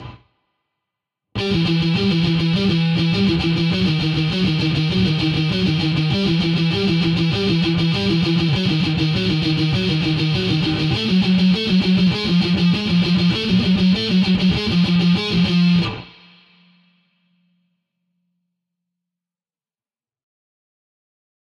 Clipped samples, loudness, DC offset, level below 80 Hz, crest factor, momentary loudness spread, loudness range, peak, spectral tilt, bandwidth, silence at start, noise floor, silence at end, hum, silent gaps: under 0.1%; -17 LUFS; under 0.1%; -42 dBFS; 12 dB; 3 LU; 3 LU; -6 dBFS; -7 dB/octave; 7.4 kHz; 0 s; under -90 dBFS; 5.35 s; none; none